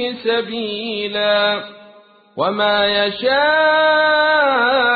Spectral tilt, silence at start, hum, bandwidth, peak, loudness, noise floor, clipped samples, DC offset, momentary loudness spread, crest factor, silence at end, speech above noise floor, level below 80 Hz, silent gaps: -8.5 dB/octave; 0 s; none; 4.8 kHz; -4 dBFS; -16 LUFS; -46 dBFS; under 0.1%; under 0.1%; 10 LU; 14 dB; 0 s; 30 dB; -56 dBFS; none